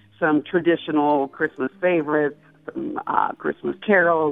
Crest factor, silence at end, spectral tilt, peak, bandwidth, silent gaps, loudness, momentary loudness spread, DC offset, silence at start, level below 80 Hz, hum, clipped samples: 18 dB; 0 s; -9 dB/octave; -2 dBFS; 3.9 kHz; none; -22 LUFS; 11 LU; under 0.1%; 0.2 s; -66 dBFS; none; under 0.1%